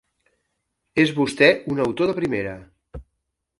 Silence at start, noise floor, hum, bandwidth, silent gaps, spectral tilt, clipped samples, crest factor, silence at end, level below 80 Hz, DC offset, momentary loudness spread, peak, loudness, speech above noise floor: 0.95 s; -77 dBFS; none; 11.5 kHz; none; -5.5 dB/octave; under 0.1%; 22 dB; 0.6 s; -50 dBFS; under 0.1%; 11 LU; 0 dBFS; -20 LUFS; 57 dB